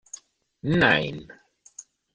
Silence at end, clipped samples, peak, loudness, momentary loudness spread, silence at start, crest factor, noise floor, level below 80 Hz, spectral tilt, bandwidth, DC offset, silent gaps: 0.35 s; under 0.1%; -4 dBFS; -22 LUFS; 26 LU; 0.65 s; 24 dB; -49 dBFS; -54 dBFS; -5 dB/octave; 10 kHz; under 0.1%; none